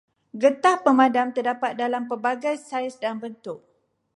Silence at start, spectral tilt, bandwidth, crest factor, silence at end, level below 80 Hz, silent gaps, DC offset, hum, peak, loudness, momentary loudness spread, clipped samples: 0.35 s; -4 dB/octave; 11.5 kHz; 20 dB; 0.6 s; -80 dBFS; none; under 0.1%; none; -4 dBFS; -23 LUFS; 18 LU; under 0.1%